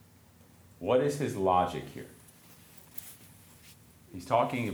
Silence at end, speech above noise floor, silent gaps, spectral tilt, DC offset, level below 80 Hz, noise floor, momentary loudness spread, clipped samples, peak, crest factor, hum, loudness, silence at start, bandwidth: 0 s; 29 dB; none; -6 dB/octave; under 0.1%; -64 dBFS; -58 dBFS; 24 LU; under 0.1%; -12 dBFS; 20 dB; none; -30 LUFS; 0.8 s; over 20 kHz